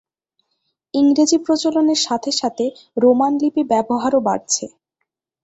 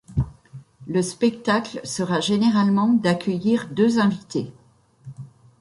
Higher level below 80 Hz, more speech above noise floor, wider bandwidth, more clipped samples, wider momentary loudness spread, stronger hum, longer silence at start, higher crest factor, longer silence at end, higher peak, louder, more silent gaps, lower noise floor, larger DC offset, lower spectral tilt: second, -62 dBFS vs -46 dBFS; first, 60 dB vs 29 dB; second, 8.2 kHz vs 11.5 kHz; neither; second, 8 LU vs 16 LU; neither; first, 0.95 s vs 0.1 s; about the same, 16 dB vs 16 dB; first, 0.75 s vs 0.35 s; about the same, -4 dBFS vs -6 dBFS; first, -17 LUFS vs -22 LUFS; neither; first, -76 dBFS vs -49 dBFS; neither; second, -3 dB/octave vs -6 dB/octave